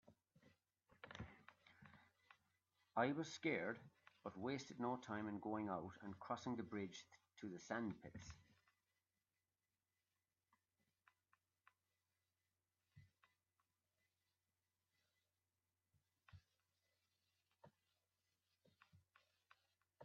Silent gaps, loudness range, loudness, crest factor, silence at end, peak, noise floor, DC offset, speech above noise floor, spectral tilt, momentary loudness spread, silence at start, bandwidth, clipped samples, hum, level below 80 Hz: none; 9 LU; -49 LUFS; 28 dB; 0 s; -26 dBFS; under -90 dBFS; under 0.1%; over 42 dB; -4.5 dB/octave; 23 LU; 0.05 s; 7.2 kHz; under 0.1%; none; -84 dBFS